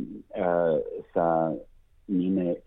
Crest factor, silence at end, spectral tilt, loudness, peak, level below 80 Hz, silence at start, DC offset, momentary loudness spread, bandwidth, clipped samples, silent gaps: 16 dB; 0.05 s; -11 dB/octave; -27 LUFS; -12 dBFS; -58 dBFS; 0 s; under 0.1%; 7 LU; 3.9 kHz; under 0.1%; none